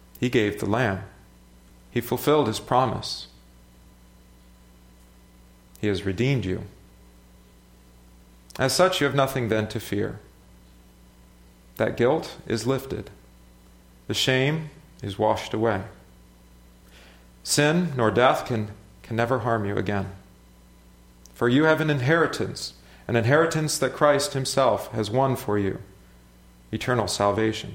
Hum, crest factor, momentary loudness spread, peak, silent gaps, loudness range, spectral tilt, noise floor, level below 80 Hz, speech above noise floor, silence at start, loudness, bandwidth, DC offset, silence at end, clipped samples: 60 Hz at -50 dBFS; 20 dB; 15 LU; -4 dBFS; none; 8 LU; -5 dB/octave; -53 dBFS; -52 dBFS; 29 dB; 0.2 s; -24 LUFS; 16.5 kHz; under 0.1%; 0 s; under 0.1%